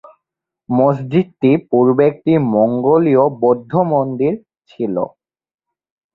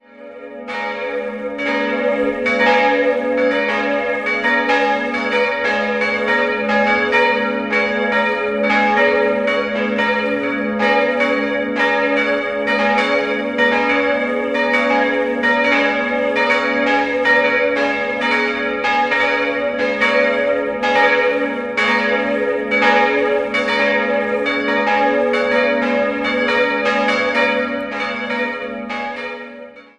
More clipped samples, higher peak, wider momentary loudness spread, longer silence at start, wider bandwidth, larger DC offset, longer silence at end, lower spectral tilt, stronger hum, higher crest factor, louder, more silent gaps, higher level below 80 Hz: neither; about the same, -2 dBFS vs -2 dBFS; about the same, 9 LU vs 7 LU; first, 0.7 s vs 0.2 s; second, 4.4 kHz vs 9.8 kHz; neither; first, 1.05 s vs 0.15 s; first, -11 dB/octave vs -4.5 dB/octave; neither; about the same, 14 dB vs 16 dB; about the same, -15 LUFS vs -16 LUFS; neither; about the same, -58 dBFS vs -54 dBFS